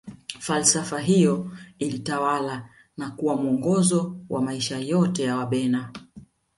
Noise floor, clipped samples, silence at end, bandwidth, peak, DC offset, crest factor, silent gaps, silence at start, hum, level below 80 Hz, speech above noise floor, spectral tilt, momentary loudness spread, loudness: -49 dBFS; under 0.1%; 0.35 s; 11.5 kHz; -4 dBFS; under 0.1%; 20 dB; none; 0.05 s; none; -62 dBFS; 26 dB; -4.5 dB/octave; 16 LU; -24 LUFS